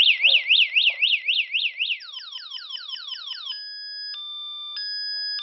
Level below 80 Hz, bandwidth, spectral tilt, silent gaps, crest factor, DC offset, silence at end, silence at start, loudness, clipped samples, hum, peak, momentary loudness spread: under -90 dBFS; 6 kHz; 16.5 dB/octave; none; 18 dB; under 0.1%; 0 s; 0 s; -21 LUFS; under 0.1%; none; -6 dBFS; 17 LU